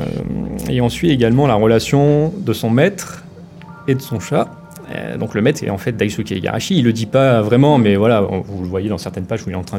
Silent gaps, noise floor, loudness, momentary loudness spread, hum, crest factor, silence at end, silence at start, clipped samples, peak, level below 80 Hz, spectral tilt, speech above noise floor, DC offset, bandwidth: none; -36 dBFS; -16 LUFS; 11 LU; none; 16 dB; 0 s; 0 s; under 0.1%; 0 dBFS; -42 dBFS; -6.5 dB/octave; 21 dB; under 0.1%; 16.5 kHz